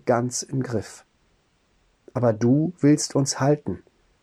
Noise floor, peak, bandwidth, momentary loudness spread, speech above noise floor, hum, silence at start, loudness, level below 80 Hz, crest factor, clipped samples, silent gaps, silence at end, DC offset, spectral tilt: -65 dBFS; -8 dBFS; 13.5 kHz; 14 LU; 43 dB; none; 0.05 s; -23 LUFS; -60 dBFS; 16 dB; under 0.1%; none; 0.45 s; under 0.1%; -5.5 dB/octave